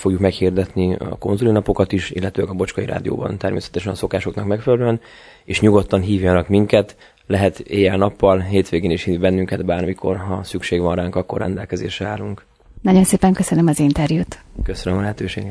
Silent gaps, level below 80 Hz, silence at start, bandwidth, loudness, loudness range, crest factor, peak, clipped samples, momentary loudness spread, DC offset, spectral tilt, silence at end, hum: none; -38 dBFS; 0 s; 11 kHz; -19 LUFS; 4 LU; 18 dB; 0 dBFS; under 0.1%; 10 LU; under 0.1%; -6.5 dB/octave; 0 s; none